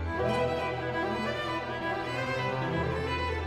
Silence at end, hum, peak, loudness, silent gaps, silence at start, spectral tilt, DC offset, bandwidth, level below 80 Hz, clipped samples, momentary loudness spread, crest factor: 0 s; none; -18 dBFS; -31 LUFS; none; 0 s; -6 dB/octave; under 0.1%; 14.5 kHz; -46 dBFS; under 0.1%; 3 LU; 14 dB